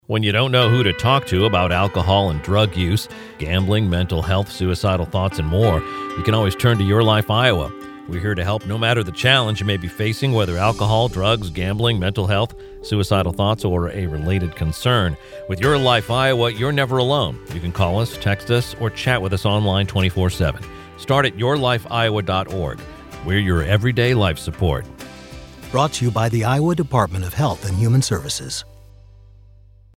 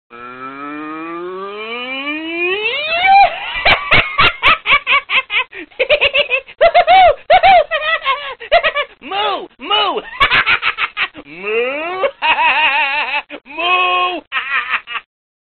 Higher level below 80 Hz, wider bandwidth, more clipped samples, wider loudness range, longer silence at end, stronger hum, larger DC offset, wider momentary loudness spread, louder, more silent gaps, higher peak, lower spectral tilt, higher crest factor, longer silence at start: about the same, -36 dBFS vs -40 dBFS; first, 16.5 kHz vs 4.7 kHz; neither; about the same, 3 LU vs 4 LU; first, 1.35 s vs 0.4 s; neither; neither; second, 10 LU vs 16 LU; second, -19 LUFS vs -13 LUFS; second, none vs 14.27-14.31 s; about the same, 0 dBFS vs 0 dBFS; first, -5.5 dB/octave vs 1 dB/octave; about the same, 18 dB vs 14 dB; about the same, 0.1 s vs 0.1 s